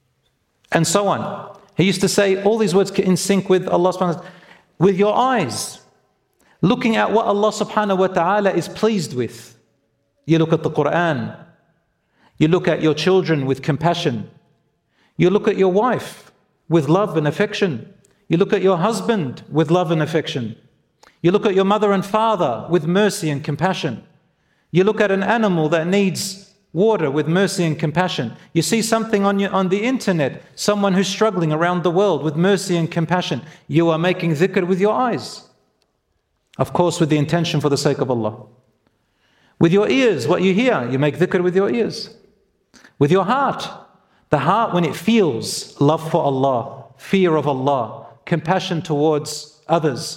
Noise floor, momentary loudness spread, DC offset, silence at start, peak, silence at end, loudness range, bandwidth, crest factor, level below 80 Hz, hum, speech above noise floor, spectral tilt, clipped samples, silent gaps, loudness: -68 dBFS; 9 LU; under 0.1%; 0.7 s; 0 dBFS; 0 s; 3 LU; 16 kHz; 18 dB; -58 dBFS; none; 51 dB; -5.5 dB/octave; under 0.1%; none; -18 LUFS